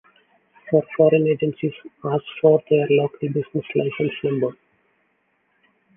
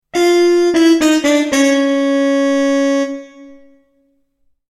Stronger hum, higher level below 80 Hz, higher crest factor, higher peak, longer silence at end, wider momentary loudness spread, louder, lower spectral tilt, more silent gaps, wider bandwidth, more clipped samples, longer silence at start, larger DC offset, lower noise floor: neither; second, -64 dBFS vs -54 dBFS; first, 20 dB vs 12 dB; about the same, -2 dBFS vs -2 dBFS; first, 1.45 s vs 1.15 s; first, 9 LU vs 5 LU; second, -21 LUFS vs -13 LUFS; first, -10.5 dB/octave vs -2.5 dB/octave; neither; second, 3.7 kHz vs 13.5 kHz; neither; first, 0.65 s vs 0.15 s; neither; first, -67 dBFS vs -60 dBFS